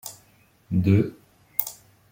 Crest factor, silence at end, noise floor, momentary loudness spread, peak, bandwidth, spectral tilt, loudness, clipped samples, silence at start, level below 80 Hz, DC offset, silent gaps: 24 dB; 0.4 s; -59 dBFS; 14 LU; -2 dBFS; 16.5 kHz; -7 dB/octave; -25 LUFS; under 0.1%; 0.05 s; -58 dBFS; under 0.1%; none